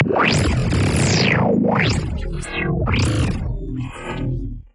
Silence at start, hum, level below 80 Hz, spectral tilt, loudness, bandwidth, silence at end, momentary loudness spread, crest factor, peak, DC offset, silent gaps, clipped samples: 0 s; none; -30 dBFS; -5.5 dB/octave; -19 LUFS; 11.5 kHz; 0.15 s; 11 LU; 16 dB; -4 dBFS; under 0.1%; none; under 0.1%